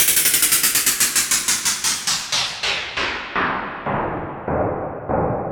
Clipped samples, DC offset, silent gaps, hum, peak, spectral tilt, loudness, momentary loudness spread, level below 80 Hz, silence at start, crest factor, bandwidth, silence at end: under 0.1%; under 0.1%; none; none; -2 dBFS; -1 dB/octave; -18 LUFS; 11 LU; -44 dBFS; 0 s; 18 dB; over 20 kHz; 0 s